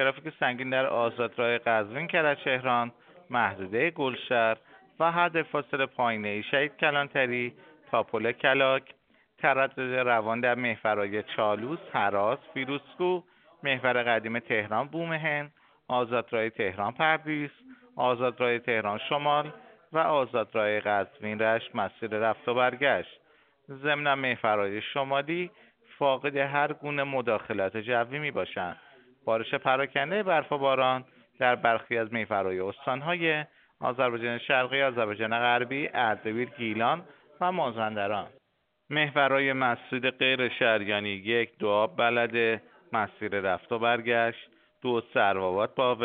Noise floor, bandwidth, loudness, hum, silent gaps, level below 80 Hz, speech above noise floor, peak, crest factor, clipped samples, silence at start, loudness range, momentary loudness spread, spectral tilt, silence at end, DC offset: -75 dBFS; 4.6 kHz; -28 LUFS; none; none; -74 dBFS; 47 dB; -6 dBFS; 22 dB; under 0.1%; 0 s; 3 LU; 8 LU; -2.5 dB/octave; 0 s; under 0.1%